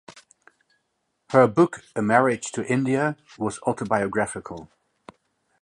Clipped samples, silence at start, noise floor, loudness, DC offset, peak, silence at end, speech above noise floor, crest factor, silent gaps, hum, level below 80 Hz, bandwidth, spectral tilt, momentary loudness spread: under 0.1%; 0.1 s; -75 dBFS; -23 LUFS; under 0.1%; -2 dBFS; 0.95 s; 52 dB; 22 dB; none; none; -62 dBFS; 11.5 kHz; -6 dB/octave; 12 LU